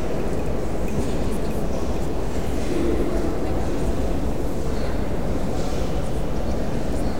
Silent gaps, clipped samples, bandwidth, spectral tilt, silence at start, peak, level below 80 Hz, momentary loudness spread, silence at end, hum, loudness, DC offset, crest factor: none; under 0.1%; 17 kHz; -6.5 dB/octave; 0 s; -10 dBFS; -28 dBFS; 3 LU; 0 s; none; -26 LUFS; 7%; 14 dB